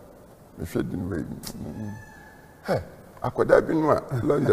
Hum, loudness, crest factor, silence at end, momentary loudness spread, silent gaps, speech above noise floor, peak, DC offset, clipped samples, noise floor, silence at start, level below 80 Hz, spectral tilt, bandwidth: none; -26 LUFS; 22 dB; 0 s; 19 LU; none; 25 dB; -4 dBFS; under 0.1%; under 0.1%; -49 dBFS; 0 s; -48 dBFS; -7 dB/octave; 15.5 kHz